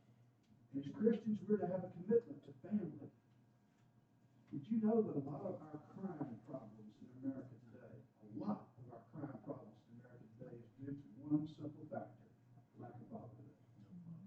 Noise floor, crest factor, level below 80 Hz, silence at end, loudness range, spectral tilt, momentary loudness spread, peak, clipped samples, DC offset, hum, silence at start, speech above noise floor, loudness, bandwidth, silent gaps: -72 dBFS; 24 dB; -84 dBFS; 0 s; 9 LU; -9.5 dB/octave; 22 LU; -22 dBFS; under 0.1%; under 0.1%; none; 0.1 s; 31 dB; -44 LUFS; 4.9 kHz; none